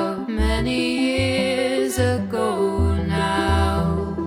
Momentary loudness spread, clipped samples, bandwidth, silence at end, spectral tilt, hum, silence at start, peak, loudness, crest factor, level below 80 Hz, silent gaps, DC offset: 3 LU; under 0.1%; 16.5 kHz; 0 s; -5.5 dB/octave; none; 0 s; -6 dBFS; -21 LUFS; 14 dB; -30 dBFS; none; under 0.1%